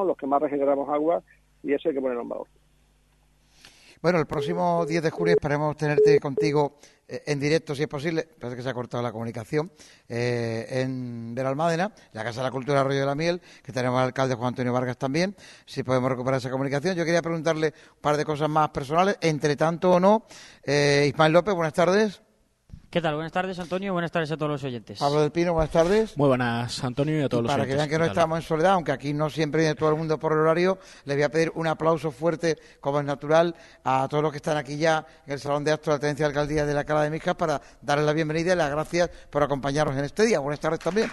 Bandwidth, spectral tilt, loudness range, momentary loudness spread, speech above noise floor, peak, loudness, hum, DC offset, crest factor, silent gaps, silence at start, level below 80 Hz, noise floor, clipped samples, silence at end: 12.5 kHz; -6 dB/octave; 6 LU; 9 LU; 37 dB; -4 dBFS; -25 LUFS; none; under 0.1%; 20 dB; none; 0 s; -52 dBFS; -62 dBFS; under 0.1%; 0 s